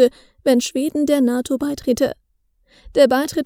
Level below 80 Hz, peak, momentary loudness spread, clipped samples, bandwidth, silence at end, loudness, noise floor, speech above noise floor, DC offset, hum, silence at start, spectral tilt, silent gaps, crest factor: -50 dBFS; 0 dBFS; 8 LU; under 0.1%; 20 kHz; 0 s; -19 LUFS; -63 dBFS; 46 dB; under 0.1%; none; 0 s; -4 dB/octave; none; 18 dB